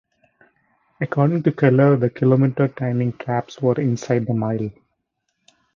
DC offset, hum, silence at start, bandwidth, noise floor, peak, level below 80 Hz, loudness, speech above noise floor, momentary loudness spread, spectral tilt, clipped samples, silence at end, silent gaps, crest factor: under 0.1%; none; 1 s; 7.2 kHz; -74 dBFS; -2 dBFS; -58 dBFS; -20 LUFS; 56 dB; 10 LU; -9 dB/octave; under 0.1%; 1.05 s; none; 18 dB